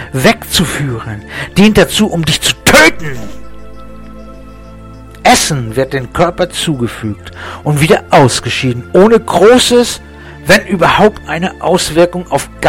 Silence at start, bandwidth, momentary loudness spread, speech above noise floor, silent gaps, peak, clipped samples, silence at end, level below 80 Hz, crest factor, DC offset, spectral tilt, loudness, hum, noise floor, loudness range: 0 s; 17.5 kHz; 15 LU; 21 dB; none; 0 dBFS; 0.2%; 0 s; -32 dBFS; 12 dB; under 0.1%; -4 dB/octave; -10 LUFS; none; -31 dBFS; 5 LU